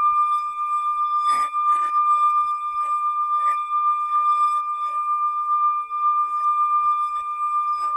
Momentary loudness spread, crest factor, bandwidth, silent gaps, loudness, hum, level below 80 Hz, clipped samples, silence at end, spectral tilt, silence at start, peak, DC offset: 5 LU; 10 dB; 11 kHz; none; -21 LUFS; none; -66 dBFS; under 0.1%; 0 s; 0 dB/octave; 0 s; -12 dBFS; under 0.1%